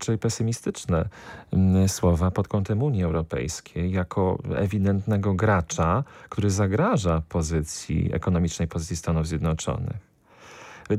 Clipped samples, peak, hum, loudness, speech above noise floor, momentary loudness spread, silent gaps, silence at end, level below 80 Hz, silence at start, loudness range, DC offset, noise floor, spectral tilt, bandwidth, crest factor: under 0.1%; -10 dBFS; none; -25 LUFS; 26 dB; 8 LU; none; 0 s; -40 dBFS; 0 s; 3 LU; under 0.1%; -50 dBFS; -6.5 dB/octave; 14.5 kHz; 14 dB